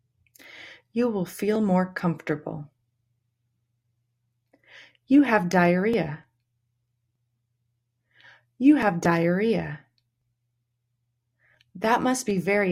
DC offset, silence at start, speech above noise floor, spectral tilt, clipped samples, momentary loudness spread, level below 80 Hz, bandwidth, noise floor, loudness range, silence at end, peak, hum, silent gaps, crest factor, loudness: under 0.1%; 0.55 s; 54 dB; -6.5 dB/octave; under 0.1%; 18 LU; -64 dBFS; 16 kHz; -77 dBFS; 5 LU; 0 s; -6 dBFS; none; none; 20 dB; -23 LUFS